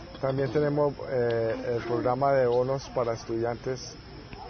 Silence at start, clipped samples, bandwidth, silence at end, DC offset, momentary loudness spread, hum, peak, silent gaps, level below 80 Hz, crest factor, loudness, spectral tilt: 0 s; under 0.1%; 6.6 kHz; 0 s; under 0.1%; 11 LU; none; -12 dBFS; none; -52 dBFS; 14 dB; -28 LUFS; -6.5 dB/octave